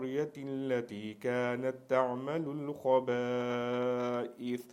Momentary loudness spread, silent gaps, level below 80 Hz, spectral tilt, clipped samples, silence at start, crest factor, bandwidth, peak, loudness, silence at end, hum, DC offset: 8 LU; none; -80 dBFS; -6.5 dB/octave; under 0.1%; 0 s; 18 dB; 15.5 kHz; -14 dBFS; -34 LUFS; 0 s; none; under 0.1%